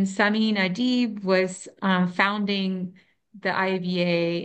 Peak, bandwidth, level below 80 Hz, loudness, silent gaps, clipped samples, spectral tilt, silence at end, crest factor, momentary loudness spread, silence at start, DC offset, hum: -4 dBFS; 8.8 kHz; -72 dBFS; -24 LUFS; none; under 0.1%; -5.5 dB/octave; 0 s; 20 dB; 8 LU; 0 s; under 0.1%; none